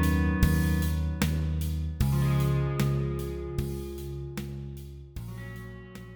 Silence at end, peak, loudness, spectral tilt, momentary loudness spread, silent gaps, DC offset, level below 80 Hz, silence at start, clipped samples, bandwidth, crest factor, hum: 0 s; -8 dBFS; -29 LUFS; -6.5 dB/octave; 16 LU; none; under 0.1%; -34 dBFS; 0 s; under 0.1%; over 20 kHz; 20 dB; none